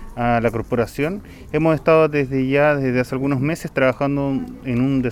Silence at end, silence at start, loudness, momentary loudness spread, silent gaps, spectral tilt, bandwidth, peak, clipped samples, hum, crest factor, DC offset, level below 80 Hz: 0 s; 0 s; -19 LUFS; 9 LU; none; -7.5 dB/octave; 15 kHz; -4 dBFS; under 0.1%; none; 16 dB; 0.1%; -40 dBFS